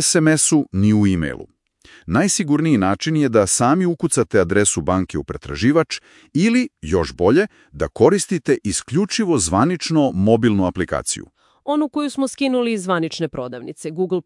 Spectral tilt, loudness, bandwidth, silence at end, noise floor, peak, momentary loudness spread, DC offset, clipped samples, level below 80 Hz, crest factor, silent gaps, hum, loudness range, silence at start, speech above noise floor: -5 dB/octave; -18 LUFS; 12 kHz; 0.05 s; -49 dBFS; 0 dBFS; 10 LU; under 0.1%; under 0.1%; -46 dBFS; 18 dB; none; none; 3 LU; 0 s; 31 dB